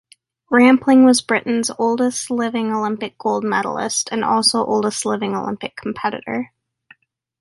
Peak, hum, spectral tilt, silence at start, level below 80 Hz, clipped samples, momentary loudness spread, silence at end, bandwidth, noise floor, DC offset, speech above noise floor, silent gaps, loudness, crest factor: -2 dBFS; none; -3.5 dB/octave; 0.5 s; -62 dBFS; under 0.1%; 13 LU; 0.95 s; 11.5 kHz; -52 dBFS; under 0.1%; 35 dB; none; -18 LUFS; 16 dB